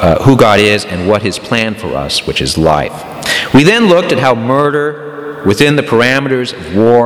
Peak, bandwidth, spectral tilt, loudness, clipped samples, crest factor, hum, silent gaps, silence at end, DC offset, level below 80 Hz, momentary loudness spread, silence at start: 0 dBFS; 17 kHz; -5 dB/octave; -10 LUFS; 0.8%; 10 dB; none; none; 0 s; under 0.1%; -34 dBFS; 10 LU; 0 s